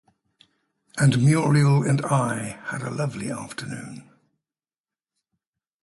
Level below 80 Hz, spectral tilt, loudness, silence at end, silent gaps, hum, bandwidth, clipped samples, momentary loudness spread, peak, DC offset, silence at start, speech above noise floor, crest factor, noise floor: -60 dBFS; -6.5 dB/octave; -23 LUFS; 1.8 s; none; none; 11.5 kHz; under 0.1%; 16 LU; -8 dBFS; under 0.1%; 0.95 s; over 68 dB; 16 dB; under -90 dBFS